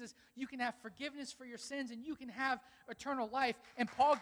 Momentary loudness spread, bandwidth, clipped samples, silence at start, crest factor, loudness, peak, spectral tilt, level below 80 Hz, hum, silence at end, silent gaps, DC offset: 12 LU; over 20 kHz; under 0.1%; 0 s; 20 dB; -40 LUFS; -20 dBFS; -3.5 dB/octave; -76 dBFS; none; 0 s; none; under 0.1%